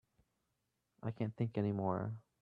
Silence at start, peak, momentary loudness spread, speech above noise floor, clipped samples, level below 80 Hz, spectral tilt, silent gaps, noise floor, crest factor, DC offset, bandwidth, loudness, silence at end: 1.05 s; -22 dBFS; 9 LU; 47 dB; under 0.1%; -74 dBFS; -10.5 dB/octave; none; -85 dBFS; 20 dB; under 0.1%; 4.8 kHz; -40 LUFS; 0.2 s